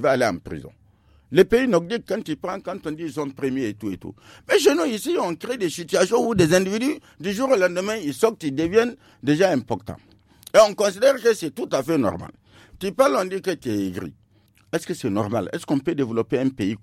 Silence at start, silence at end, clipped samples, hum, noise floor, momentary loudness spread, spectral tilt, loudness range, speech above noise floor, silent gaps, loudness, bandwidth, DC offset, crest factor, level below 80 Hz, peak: 0 s; 0.05 s; under 0.1%; none; -58 dBFS; 13 LU; -5 dB/octave; 5 LU; 36 dB; none; -22 LUFS; 16 kHz; under 0.1%; 20 dB; -54 dBFS; -4 dBFS